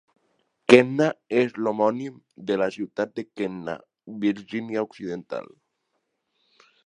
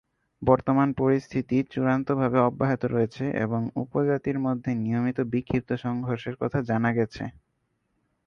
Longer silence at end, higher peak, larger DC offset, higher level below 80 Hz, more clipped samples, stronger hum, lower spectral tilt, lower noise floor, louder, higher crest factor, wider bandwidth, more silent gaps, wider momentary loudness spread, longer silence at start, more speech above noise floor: first, 1.45 s vs 0.95 s; first, 0 dBFS vs -6 dBFS; neither; second, -68 dBFS vs -54 dBFS; neither; neither; second, -6 dB/octave vs -9 dB/octave; about the same, -76 dBFS vs -74 dBFS; about the same, -24 LUFS vs -26 LUFS; first, 26 dB vs 20 dB; first, 11 kHz vs 6.8 kHz; neither; first, 19 LU vs 7 LU; first, 0.7 s vs 0.4 s; about the same, 52 dB vs 49 dB